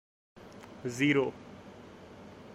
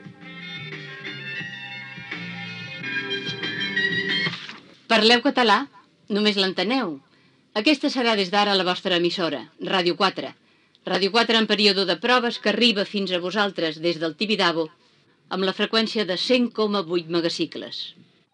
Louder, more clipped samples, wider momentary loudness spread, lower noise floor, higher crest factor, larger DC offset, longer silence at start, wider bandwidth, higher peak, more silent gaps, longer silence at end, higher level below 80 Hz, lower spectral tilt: second, -30 LUFS vs -22 LUFS; neither; first, 23 LU vs 15 LU; second, -50 dBFS vs -59 dBFS; about the same, 22 dB vs 22 dB; neither; first, 0.4 s vs 0 s; first, 14 kHz vs 11 kHz; second, -14 dBFS vs -2 dBFS; neither; second, 0 s vs 0.4 s; first, -68 dBFS vs -82 dBFS; about the same, -5.5 dB/octave vs -4.5 dB/octave